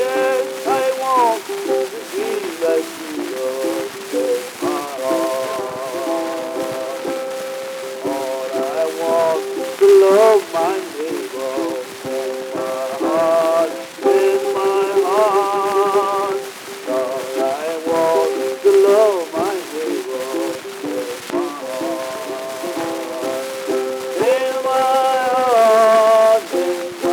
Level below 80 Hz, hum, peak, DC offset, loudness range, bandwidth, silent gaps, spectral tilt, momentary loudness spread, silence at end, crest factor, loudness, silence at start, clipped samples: -72 dBFS; none; -2 dBFS; under 0.1%; 8 LU; 19.5 kHz; none; -3.5 dB/octave; 12 LU; 0 s; 16 dB; -18 LUFS; 0 s; under 0.1%